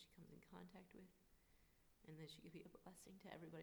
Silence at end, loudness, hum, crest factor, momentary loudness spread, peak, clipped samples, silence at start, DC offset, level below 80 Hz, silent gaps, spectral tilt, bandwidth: 0 s; -62 LUFS; none; 20 dB; 6 LU; -42 dBFS; under 0.1%; 0 s; under 0.1%; -80 dBFS; none; -5 dB/octave; over 20 kHz